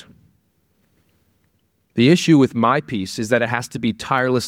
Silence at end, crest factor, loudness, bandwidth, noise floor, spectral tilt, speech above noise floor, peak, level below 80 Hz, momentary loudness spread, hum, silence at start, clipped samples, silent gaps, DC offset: 0 s; 18 dB; -18 LUFS; 16 kHz; -65 dBFS; -5.5 dB/octave; 48 dB; -2 dBFS; -58 dBFS; 11 LU; none; 1.95 s; under 0.1%; none; under 0.1%